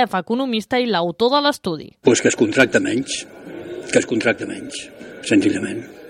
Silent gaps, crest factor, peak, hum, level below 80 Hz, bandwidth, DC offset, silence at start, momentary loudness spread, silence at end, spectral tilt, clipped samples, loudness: none; 18 dB; -2 dBFS; none; -58 dBFS; 15 kHz; under 0.1%; 0 s; 16 LU; 0 s; -4 dB/octave; under 0.1%; -19 LUFS